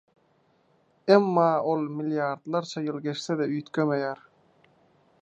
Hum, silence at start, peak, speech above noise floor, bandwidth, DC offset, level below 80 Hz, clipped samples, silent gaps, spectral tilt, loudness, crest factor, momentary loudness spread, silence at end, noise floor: none; 1.05 s; -4 dBFS; 40 dB; 8.4 kHz; under 0.1%; -80 dBFS; under 0.1%; none; -6.5 dB/octave; -26 LUFS; 24 dB; 11 LU; 1.05 s; -66 dBFS